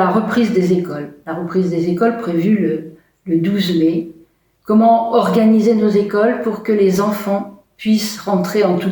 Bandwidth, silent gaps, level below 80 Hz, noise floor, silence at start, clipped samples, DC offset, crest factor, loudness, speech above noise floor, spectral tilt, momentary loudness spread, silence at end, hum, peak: over 20 kHz; none; -58 dBFS; -51 dBFS; 0 s; under 0.1%; under 0.1%; 14 dB; -16 LUFS; 36 dB; -6.5 dB/octave; 12 LU; 0 s; none; -2 dBFS